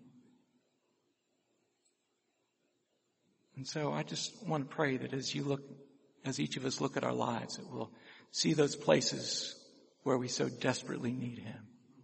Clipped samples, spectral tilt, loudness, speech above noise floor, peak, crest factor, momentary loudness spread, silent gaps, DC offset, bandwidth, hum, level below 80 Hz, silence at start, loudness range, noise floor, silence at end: under 0.1%; -4 dB/octave; -36 LUFS; 45 dB; -10 dBFS; 28 dB; 15 LU; none; under 0.1%; 8.4 kHz; none; -78 dBFS; 0 s; 9 LU; -81 dBFS; 0 s